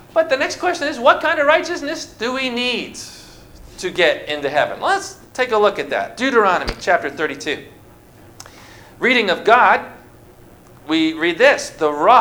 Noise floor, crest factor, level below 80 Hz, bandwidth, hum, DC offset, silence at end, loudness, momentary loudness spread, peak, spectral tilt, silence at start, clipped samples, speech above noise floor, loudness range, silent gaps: -44 dBFS; 18 dB; -46 dBFS; over 20 kHz; none; under 0.1%; 0 s; -17 LUFS; 11 LU; 0 dBFS; -3 dB/octave; 0.15 s; under 0.1%; 28 dB; 4 LU; none